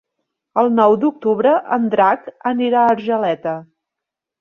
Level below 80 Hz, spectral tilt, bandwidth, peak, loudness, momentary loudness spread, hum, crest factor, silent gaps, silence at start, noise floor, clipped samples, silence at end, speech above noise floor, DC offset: -66 dBFS; -8 dB/octave; 5.8 kHz; -2 dBFS; -16 LUFS; 9 LU; none; 16 dB; none; 0.55 s; -84 dBFS; under 0.1%; 0.75 s; 68 dB; under 0.1%